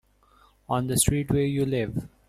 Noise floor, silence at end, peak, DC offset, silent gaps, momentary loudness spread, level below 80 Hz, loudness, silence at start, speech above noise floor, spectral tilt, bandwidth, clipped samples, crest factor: -60 dBFS; 0.2 s; -8 dBFS; under 0.1%; none; 7 LU; -44 dBFS; -25 LUFS; 0.7 s; 35 dB; -5 dB/octave; 16 kHz; under 0.1%; 20 dB